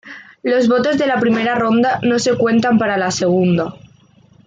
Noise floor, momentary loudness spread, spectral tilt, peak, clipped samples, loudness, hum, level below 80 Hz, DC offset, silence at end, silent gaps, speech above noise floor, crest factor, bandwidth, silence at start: -49 dBFS; 5 LU; -5.5 dB/octave; -4 dBFS; under 0.1%; -15 LUFS; none; -56 dBFS; under 0.1%; 0.7 s; none; 35 dB; 12 dB; 9.2 kHz; 0.05 s